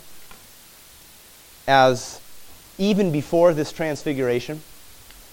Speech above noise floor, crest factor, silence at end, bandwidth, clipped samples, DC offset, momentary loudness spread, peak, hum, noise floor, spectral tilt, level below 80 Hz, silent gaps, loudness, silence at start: 28 dB; 20 dB; 0.2 s; 17 kHz; under 0.1%; under 0.1%; 19 LU; -2 dBFS; none; -47 dBFS; -5.5 dB/octave; -52 dBFS; none; -21 LUFS; 0.05 s